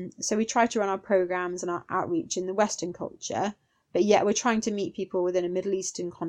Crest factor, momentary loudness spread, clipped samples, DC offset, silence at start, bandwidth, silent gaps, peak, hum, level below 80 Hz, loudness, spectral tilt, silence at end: 20 dB; 10 LU; under 0.1%; under 0.1%; 0 s; 11.5 kHz; none; -8 dBFS; none; -66 dBFS; -27 LUFS; -4 dB/octave; 0 s